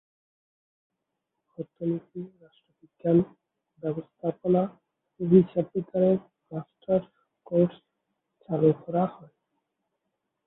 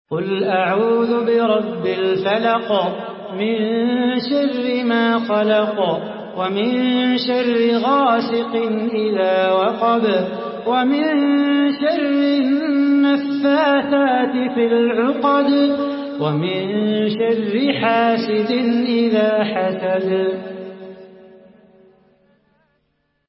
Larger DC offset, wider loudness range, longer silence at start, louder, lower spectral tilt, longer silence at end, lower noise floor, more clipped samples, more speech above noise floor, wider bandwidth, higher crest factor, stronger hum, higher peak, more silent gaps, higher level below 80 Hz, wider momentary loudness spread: neither; first, 6 LU vs 3 LU; first, 1.6 s vs 0.1 s; second, -27 LUFS vs -18 LUFS; first, -13 dB/octave vs -10.5 dB/octave; second, 1.35 s vs 2.15 s; first, -83 dBFS vs -67 dBFS; neither; first, 57 dB vs 50 dB; second, 3.9 kHz vs 5.8 kHz; first, 22 dB vs 14 dB; neither; about the same, -6 dBFS vs -4 dBFS; neither; about the same, -68 dBFS vs -66 dBFS; first, 17 LU vs 6 LU